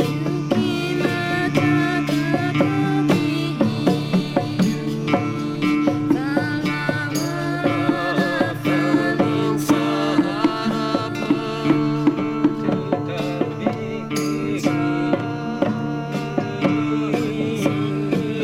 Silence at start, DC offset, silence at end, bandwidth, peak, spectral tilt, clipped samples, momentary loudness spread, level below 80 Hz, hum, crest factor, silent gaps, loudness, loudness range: 0 s; under 0.1%; 0 s; 15.5 kHz; -2 dBFS; -6.5 dB/octave; under 0.1%; 5 LU; -54 dBFS; none; 18 dB; none; -21 LUFS; 3 LU